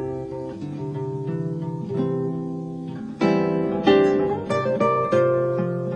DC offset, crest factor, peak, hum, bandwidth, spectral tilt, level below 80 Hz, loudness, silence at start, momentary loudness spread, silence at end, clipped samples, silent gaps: under 0.1%; 18 dB; -4 dBFS; none; 8.8 kHz; -8 dB/octave; -56 dBFS; -23 LUFS; 0 s; 13 LU; 0 s; under 0.1%; none